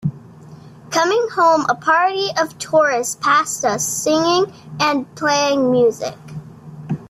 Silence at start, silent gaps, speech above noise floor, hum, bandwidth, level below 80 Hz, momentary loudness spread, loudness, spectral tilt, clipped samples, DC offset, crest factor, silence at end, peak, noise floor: 0 s; none; 23 dB; none; 15.5 kHz; -60 dBFS; 13 LU; -17 LUFS; -3.5 dB/octave; under 0.1%; under 0.1%; 14 dB; 0.05 s; -4 dBFS; -40 dBFS